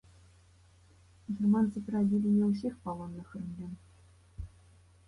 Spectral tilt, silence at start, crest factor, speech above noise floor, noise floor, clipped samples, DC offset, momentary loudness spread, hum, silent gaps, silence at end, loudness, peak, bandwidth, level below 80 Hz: -9.5 dB/octave; 1.3 s; 16 dB; 31 dB; -61 dBFS; under 0.1%; under 0.1%; 21 LU; none; none; 0.6 s; -32 LUFS; -18 dBFS; 10.5 kHz; -58 dBFS